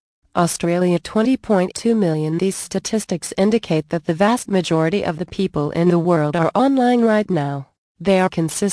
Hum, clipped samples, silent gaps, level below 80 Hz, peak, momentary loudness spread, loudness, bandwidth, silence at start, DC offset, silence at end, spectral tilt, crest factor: none; under 0.1%; 7.78-7.95 s; -52 dBFS; -2 dBFS; 7 LU; -19 LUFS; 11 kHz; 0.35 s; under 0.1%; 0 s; -6 dB/octave; 16 dB